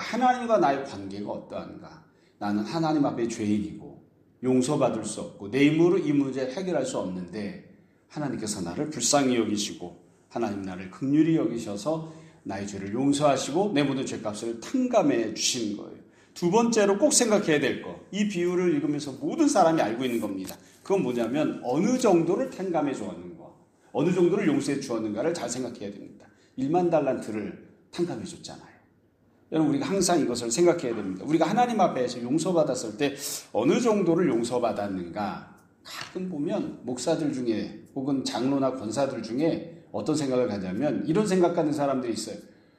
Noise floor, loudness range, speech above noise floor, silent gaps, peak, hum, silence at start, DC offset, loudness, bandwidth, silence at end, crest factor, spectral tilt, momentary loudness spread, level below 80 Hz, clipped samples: -63 dBFS; 5 LU; 37 dB; none; -6 dBFS; none; 0 s; under 0.1%; -26 LUFS; 15.5 kHz; 0.35 s; 20 dB; -5 dB/octave; 14 LU; -66 dBFS; under 0.1%